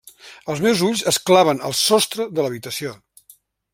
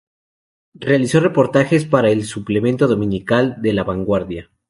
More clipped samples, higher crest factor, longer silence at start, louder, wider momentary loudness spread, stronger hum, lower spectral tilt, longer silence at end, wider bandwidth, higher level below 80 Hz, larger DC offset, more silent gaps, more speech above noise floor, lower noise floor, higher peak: neither; about the same, 18 dB vs 16 dB; second, 0.25 s vs 0.8 s; about the same, -18 LUFS vs -17 LUFS; first, 13 LU vs 6 LU; neither; second, -3.5 dB/octave vs -6.5 dB/octave; first, 0.8 s vs 0.3 s; first, 16.5 kHz vs 11.5 kHz; second, -60 dBFS vs -46 dBFS; neither; neither; second, 34 dB vs over 74 dB; second, -53 dBFS vs under -90 dBFS; about the same, -2 dBFS vs -2 dBFS